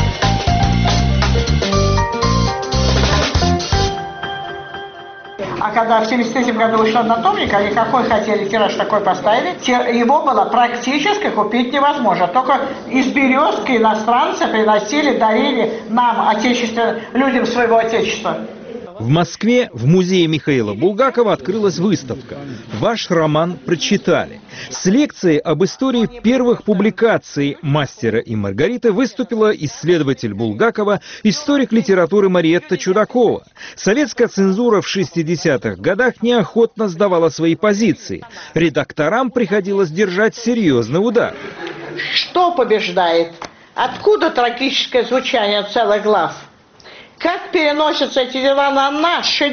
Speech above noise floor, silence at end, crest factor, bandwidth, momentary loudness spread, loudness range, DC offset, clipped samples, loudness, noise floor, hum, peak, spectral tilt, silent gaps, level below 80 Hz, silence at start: 27 dB; 0 s; 14 dB; 6.8 kHz; 7 LU; 2 LU; under 0.1%; under 0.1%; -15 LUFS; -42 dBFS; none; -2 dBFS; -4 dB/octave; none; -32 dBFS; 0 s